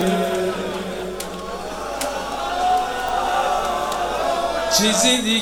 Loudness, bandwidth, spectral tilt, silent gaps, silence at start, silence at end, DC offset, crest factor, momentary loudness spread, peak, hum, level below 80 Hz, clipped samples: -21 LUFS; over 20 kHz; -2.5 dB/octave; none; 0 s; 0 s; under 0.1%; 18 dB; 13 LU; -4 dBFS; none; -44 dBFS; under 0.1%